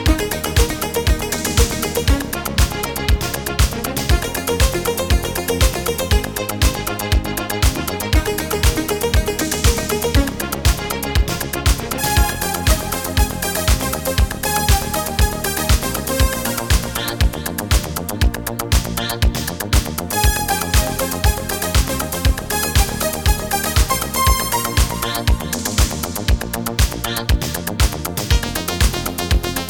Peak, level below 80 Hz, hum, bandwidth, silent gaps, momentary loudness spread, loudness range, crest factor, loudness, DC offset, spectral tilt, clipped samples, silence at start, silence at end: 0 dBFS; -22 dBFS; none; over 20 kHz; none; 4 LU; 2 LU; 18 dB; -19 LUFS; 0.3%; -4 dB/octave; under 0.1%; 0 s; 0 s